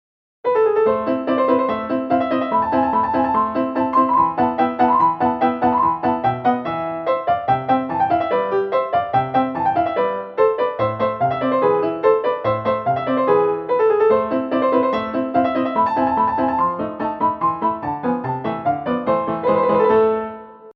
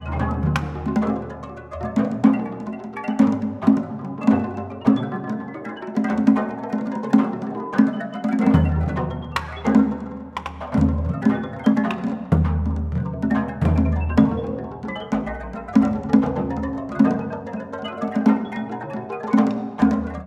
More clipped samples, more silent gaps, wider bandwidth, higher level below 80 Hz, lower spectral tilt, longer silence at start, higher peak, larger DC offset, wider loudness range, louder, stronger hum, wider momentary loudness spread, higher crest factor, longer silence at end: neither; neither; second, 5.8 kHz vs 8.2 kHz; second, -52 dBFS vs -34 dBFS; about the same, -9 dB/octave vs -8.5 dB/octave; first, 0.45 s vs 0 s; about the same, -4 dBFS vs -2 dBFS; neither; about the same, 2 LU vs 2 LU; first, -19 LUFS vs -22 LUFS; neither; second, 6 LU vs 11 LU; about the same, 16 dB vs 18 dB; about the same, 0.05 s vs 0 s